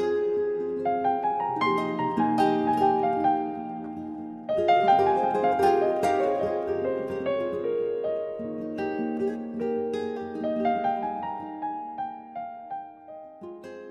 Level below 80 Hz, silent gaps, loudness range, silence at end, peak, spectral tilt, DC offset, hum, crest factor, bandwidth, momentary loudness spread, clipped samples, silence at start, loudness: -66 dBFS; none; 7 LU; 0 s; -10 dBFS; -6.5 dB/octave; under 0.1%; none; 18 dB; 12.5 kHz; 15 LU; under 0.1%; 0 s; -27 LUFS